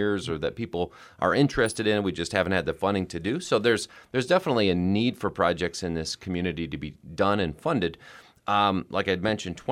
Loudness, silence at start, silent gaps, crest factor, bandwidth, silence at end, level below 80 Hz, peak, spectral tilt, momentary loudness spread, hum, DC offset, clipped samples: -26 LUFS; 0 s; none; 20 dB; 16 kHz; 0 s; -52 dBFS; -6 dBFS; -5.5 dB/octave; 8 LU; none; under 0.1%; under 0.1%